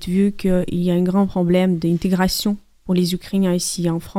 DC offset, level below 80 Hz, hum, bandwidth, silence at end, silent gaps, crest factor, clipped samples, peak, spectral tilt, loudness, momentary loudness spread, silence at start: under 0.1%; -40 dBFS; none; 16 kHz; 0 s; none; 14 dB; under 0.1%; -4 dBFS; -6 dB/octave; -19 LUFS; 4 LU; 0 s